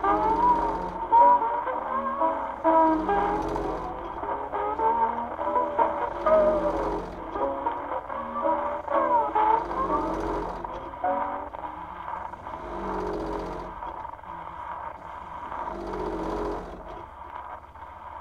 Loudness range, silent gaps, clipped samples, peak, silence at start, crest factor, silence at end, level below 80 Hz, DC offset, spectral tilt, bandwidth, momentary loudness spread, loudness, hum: 11 LU; none; under 0.1%; -8 dBFS; 0 s; 18 dB; 0 s; -46 dBFS; under 0.1%; -7 dB/octave; 8.2 kHz; 17 LU; -27 LUFS; none